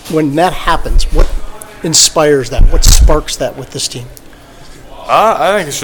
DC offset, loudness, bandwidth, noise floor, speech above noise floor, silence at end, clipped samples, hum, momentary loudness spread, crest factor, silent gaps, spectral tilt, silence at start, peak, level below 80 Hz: under 0.1%; -11 LUFS; 19.5 kHz; -34 dBFS; 25 dB; 0 s; 2%; none; 16 LU; 10 dB; none; -3 dB/octave; 0.05 s; 0 dBFS; -14 dBFS